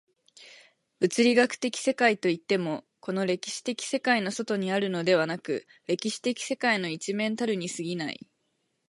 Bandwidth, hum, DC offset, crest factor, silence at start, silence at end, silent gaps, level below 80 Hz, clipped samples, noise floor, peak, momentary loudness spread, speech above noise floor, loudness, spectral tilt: 11.5 kHz; none; under 0.1%; 20 dB; 0.4 s; 0.75 s; none; -78 dBFS; under 0.1%; -76 dBFS; -8 dBFS; 10 LU; 49 dB; -27 LUFS; -4 dB/octave